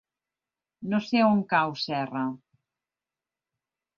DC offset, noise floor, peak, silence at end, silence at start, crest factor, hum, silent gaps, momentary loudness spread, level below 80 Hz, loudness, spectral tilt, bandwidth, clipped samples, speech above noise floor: under 0.1%; under -90 dBFS; -10 dBFS; 1.6 s; 0.8 s; 20 dB; none; none; 13 LU; -74 dBFS; -26 LUFS; -6.5 dB/octave; 7 kHz; under 0.1%; over 65 dB